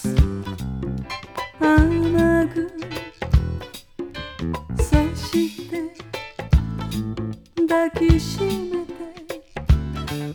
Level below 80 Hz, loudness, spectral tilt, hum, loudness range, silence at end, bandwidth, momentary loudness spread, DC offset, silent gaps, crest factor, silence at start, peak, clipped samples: -28 dBFS; -23 LUFS; -6.5 dB/octave; none; 3 LU; 0 s; 19.5 kHz; 15 LU; under 0.1%; none; 18 dB; 0 s; -4 dBFS; under 0.1%